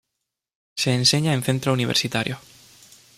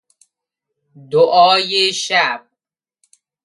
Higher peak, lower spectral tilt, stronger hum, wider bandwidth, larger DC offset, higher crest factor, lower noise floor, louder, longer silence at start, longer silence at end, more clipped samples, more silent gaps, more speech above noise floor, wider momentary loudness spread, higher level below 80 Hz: second, -4 dBFS vs 0 dBFS; first, -4 dB/octave vs -2 dB/octave; neither; first, 15.5 kHz vs 11.5 kHz; neither; about the same, 20 dB vs 18 dB; about the same, -82 dBFS vs -84 dBFS; second, -21 LUFS vs -14 LUFS; second, 0.75 s vs 1.1 s; second, 0.8 s vs 1.05 s; neither; neither; second, 60 dB vs 70 dB; first, 12 LU vs 9 LU; first, -60 dBFS vs -72 dBFS